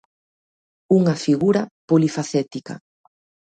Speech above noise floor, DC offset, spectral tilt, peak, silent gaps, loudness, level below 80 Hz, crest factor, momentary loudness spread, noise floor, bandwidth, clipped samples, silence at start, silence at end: over 71 dB; under 0.1%; -7 dB/octave; -4 dBFS; 1.71-1.88 s; -20 LUFS; -64 dBFS; 18 dB; 15 LU; under -90 dBFS; 9.2 kHz; under 0.1%; 0.9 s; 0.75 s